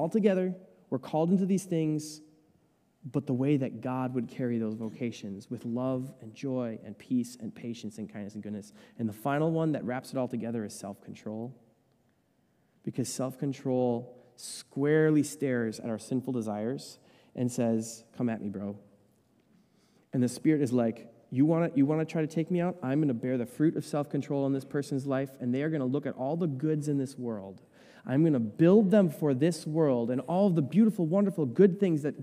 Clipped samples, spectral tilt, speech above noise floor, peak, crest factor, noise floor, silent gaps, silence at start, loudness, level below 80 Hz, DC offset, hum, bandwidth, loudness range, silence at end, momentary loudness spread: under 0.1%; -7.5 dB/octave; 41 dB; -10 dBFS; 20 dB; -70 dBFS; none; 0 s; -30 LUFS; -76 dBFS; under 0.1%; none; 15.5 kHz; 9 LU; 0 s; 15 LU